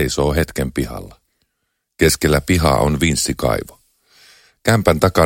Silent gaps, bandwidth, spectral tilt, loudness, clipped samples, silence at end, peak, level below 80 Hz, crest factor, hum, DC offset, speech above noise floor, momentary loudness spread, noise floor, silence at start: none; 17 kHz; -5 dB/octave; -17 LUFS; under 0.1%; 0 s; 0 dBFS; -30 dBFS; 18 dB; none; under 0.1%; 57 dB; 10 LU; -73 dBFS; 0 s